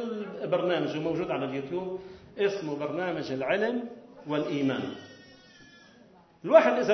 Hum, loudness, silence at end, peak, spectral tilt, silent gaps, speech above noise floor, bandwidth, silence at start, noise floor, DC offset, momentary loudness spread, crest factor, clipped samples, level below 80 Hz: none; -28 LUFS; 0 s; -6 dBFS; -6.5 dB/octave; none; 29 dB; 6.4 kHz; 0 s; -57 dBFS; under 0.1%; 19 LU; 24 dB; under 0.1%; -68 dBFS